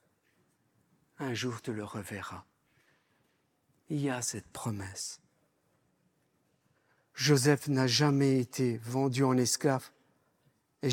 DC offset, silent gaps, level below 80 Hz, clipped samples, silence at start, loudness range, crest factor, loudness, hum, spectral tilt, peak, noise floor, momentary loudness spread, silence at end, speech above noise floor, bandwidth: under 0.1%; none; -76 dBFS; under 0.1%; 1.2 s; 13 LU; 22 dB; -31 LUFS; none; -4.5 dB/octave; -12 dBFS; -74 dBFS; 15 LU; 0 s; 44 dB; 18 kHz